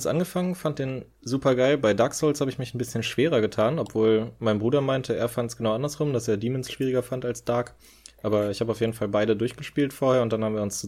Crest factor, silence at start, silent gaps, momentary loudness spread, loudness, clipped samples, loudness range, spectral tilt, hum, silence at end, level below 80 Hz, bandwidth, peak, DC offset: 16 dB; 0 s; none; 7 LU; -25 LUFS; under 0.1%; 4 LU; -5.5 dB/octave; none; 0 s; -56 dBFS; 16 kHz; -10 dBFS; under 0.1%